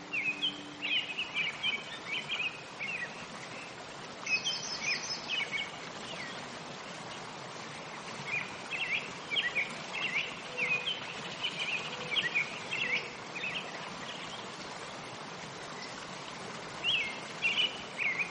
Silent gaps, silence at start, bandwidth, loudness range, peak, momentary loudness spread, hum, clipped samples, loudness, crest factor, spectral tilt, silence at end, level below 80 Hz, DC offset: none; 0 s; 10 kHz; 6 LU; -18 dBFS; 12 LU; none; under 0.1%; -34 LUFS; 18 dB; -1.5 dB/octave; 0 s; -72 dBFS; under 0.1%